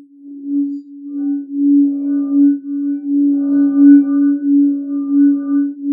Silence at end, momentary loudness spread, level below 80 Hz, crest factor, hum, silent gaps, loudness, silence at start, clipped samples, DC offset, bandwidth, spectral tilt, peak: 0 s; 12 LU; -80 dBFS; 14 dB; none; none; -14 LUFS; 0.25 s; under 0.1%; under 0.1%; 1.6 kHz; -12 dB/octave; 0 dBFS